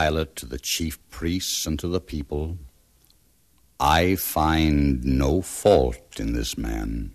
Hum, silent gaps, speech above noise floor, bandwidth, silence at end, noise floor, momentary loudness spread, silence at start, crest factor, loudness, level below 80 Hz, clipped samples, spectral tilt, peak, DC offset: none; none; 38 dB; 14 kHz; 0 s; -62 dBFS; 12 LU; 0 s; 18 dB; -24 LUFS; -32 dBFS; under 0.1%; -5 dB/octave; -6 dBFS; under 0.1%